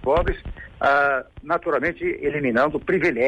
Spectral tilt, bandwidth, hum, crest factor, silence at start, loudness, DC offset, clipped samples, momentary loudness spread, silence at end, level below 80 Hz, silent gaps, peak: -7.5 dB/octave; 9 kHz; none; 14 dB; 0 s; -22 LUFS; under 0.1%; under 0.1%; 8 LU; 0 s; -38 dBFS; none; -8 dBFS